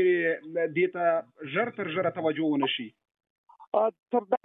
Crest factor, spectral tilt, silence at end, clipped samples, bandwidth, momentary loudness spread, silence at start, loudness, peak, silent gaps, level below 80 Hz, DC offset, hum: 16 dB; -9 dB/octave; 0.05 s; under 0.1%; 3.9 kHz; 5 LU; 0 s; -28 LUFS; -12 dBFS; 3.30-3.44 s, 3.67-3.72 s; -82 dBFS; under 0.1%; none